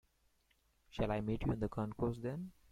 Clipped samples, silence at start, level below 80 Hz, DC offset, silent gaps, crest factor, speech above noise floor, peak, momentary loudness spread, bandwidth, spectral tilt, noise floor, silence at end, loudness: under 0.1%; 0.9 s; -54 dBFS; under 0.1%; none; 18 dB; 37 dB; -24 dBFS; 7 LU; 14 kHz; -8.5 dB/octave; -76 dBFS; 0.2 s; -40 LUFS